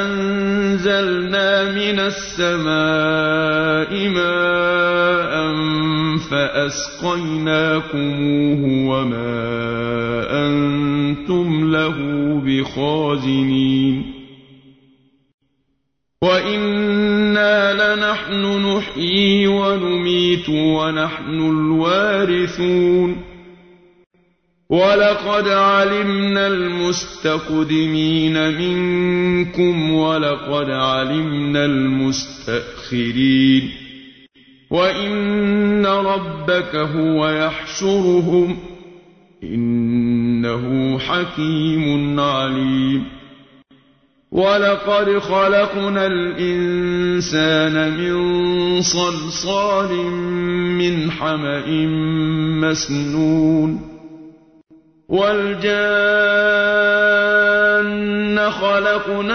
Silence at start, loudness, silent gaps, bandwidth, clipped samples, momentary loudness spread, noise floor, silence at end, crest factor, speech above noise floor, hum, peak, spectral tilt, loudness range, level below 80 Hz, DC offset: 0 s; -17 LUFS; 15.34-15.38 s; 6.6 kHz; under 0.1%; 7 LU; -71 dBFS; 0 s; 14 dB; 54 dB; none; -4 dBFS; -5.5 dB/octave; 3 LU; -46 dBFS; under 0.1%